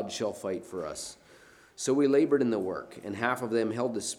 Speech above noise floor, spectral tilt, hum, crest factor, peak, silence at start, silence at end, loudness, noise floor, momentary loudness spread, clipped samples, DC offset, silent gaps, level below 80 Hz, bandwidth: 27 dB; -4.5 dB/octave; none; 18 dB; -12 dBFS; 0 s; 0 s; -30 LUFS; -56 dBFS; 14 LU; under 0.1%; under 0.1%; none; -68 dBFS; 16 kHz